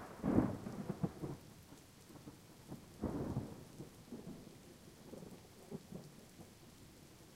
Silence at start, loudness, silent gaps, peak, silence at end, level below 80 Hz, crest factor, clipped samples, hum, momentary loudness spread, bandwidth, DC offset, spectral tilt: 0 s; -45 LUFS; none; -20 dBFS; 0 s; -62 dBFS; 26 dB; under 0.1%; none; 20 LU; 16 kHz; under 0.1%; -7 dB/octave